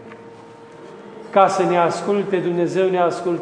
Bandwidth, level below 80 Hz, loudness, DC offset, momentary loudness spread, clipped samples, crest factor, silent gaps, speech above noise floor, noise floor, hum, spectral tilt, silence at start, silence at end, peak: 10 kHz; -72 dBFS; -18 LUFS; under 0.1%; 23 LU; under 0.1%; 20 dB; none; 23 dB; -41 dBFS; none; -6 dB/octave; 0 s; 0 s; 0 dBFS